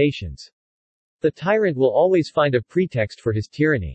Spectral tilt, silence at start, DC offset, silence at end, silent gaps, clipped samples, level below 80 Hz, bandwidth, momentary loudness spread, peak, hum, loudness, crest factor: -7.5 dB/octave; 0 s; under 0.1%; 0 s; 0.52-1.19 s; under 0.1%; -48 dBFS; 8.6 kHz; 7 LU; -6 dBFS; none; -20 LUFS; 16 dB